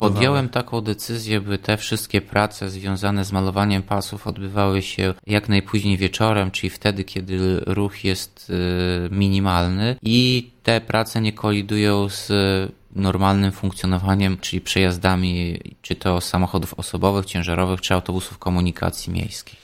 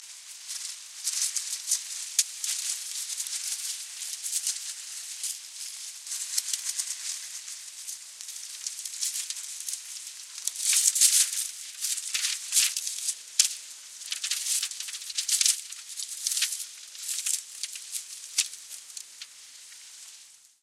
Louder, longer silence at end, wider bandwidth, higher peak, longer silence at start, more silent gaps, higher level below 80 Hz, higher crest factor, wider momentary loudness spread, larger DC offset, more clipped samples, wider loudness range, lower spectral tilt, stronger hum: first, -21 LUFS vs -28 LUFS; second, 0.1 s vs 0.25 s; about the same, 16 kHz vs 16 kHz; about the same, -2 dBFS vs -2 dBFS; about the same, 0 s vs 0 s; neither; first, -42 dBFS vs under -90 dBFS; second, 18 dB vs 30 dB; second, 8 LU vs 17 LU; neither; neither; second, 3 LU vs 9 LU; first, -5.5 dB/octave vs 7 dB/octave; neither